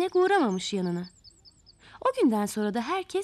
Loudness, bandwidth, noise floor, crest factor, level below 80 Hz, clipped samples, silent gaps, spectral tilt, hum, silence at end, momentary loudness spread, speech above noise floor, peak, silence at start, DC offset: -27 LUFS; 14 kHz; -57 dBFS; 14 dB; -66 dBFS; under 0.1%; none; -5 dB/octave; none; 0 s; 9 LU; 31 dB; -14 dBFS; 0 s; under 0.1%